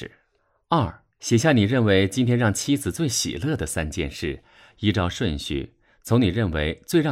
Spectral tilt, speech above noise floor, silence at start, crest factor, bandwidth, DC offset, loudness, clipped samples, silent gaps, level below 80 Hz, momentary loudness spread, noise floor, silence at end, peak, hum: -5 dB/octave; 46 dB; 0 s; 16 dB; 15.5 kHz; under 0.1%; -23 LUFS; under 0.1%; none; -42 dBFS; 12 LU; -68 dBFS; 0 s; -6 dBFS; none